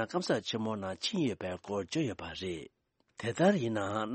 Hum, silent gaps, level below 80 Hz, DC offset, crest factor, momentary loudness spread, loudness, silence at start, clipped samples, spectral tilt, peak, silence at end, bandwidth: none; none; -66 dBFS; under 0.1%; 20 dB; 11 LU; -34 LUFS; 0 s; under 0.1%; -5.5 dB/octave; -14 dBFS; 0 s; 8.4 kHz